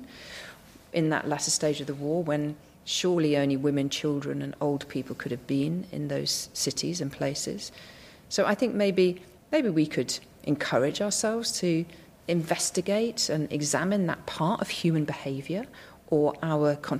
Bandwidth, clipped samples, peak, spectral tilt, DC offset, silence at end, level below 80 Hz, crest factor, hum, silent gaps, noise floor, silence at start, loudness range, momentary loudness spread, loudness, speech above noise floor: 15.5 kHz; under 0.1%; -10 dBFS; -4.5 dB/octave; under 0.1%; 0 s; -62 dBFS; 18 dB; none; none; -49 dBFS; 0 s; 3 LU; 10 LU; -28 LUFS; 21 dB